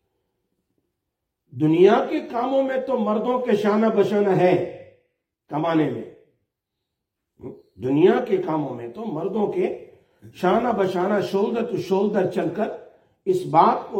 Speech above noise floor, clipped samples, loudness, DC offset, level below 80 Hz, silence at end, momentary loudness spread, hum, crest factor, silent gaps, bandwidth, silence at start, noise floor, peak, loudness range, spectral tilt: 61 dB; under 0.1%; -21 LUFS; under 0.1%; -66 dBFS; 0 s; 14 LU; none; 20 dB; none; 14.5 kHz; 1.55 s; -81 dBFS; -4 dBFS; 5 LU; -7.5 dB/octave